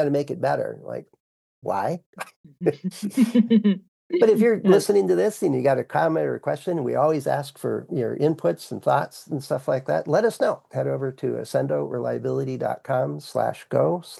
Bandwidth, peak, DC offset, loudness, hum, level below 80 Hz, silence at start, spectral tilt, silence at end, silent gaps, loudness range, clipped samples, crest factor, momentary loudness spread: 12.5 kHz; -4 dBFS; under 0.1%; -23 LUFS; none; -76 dBFS; 0 s; -7 dB/octave; 0 s; 1.20-1.62 s, 2.06-2.13 s, 2.36-2.44 s, 3.88-4.10 s; 6 LU; under 0.1%; 18 dB; 11 LU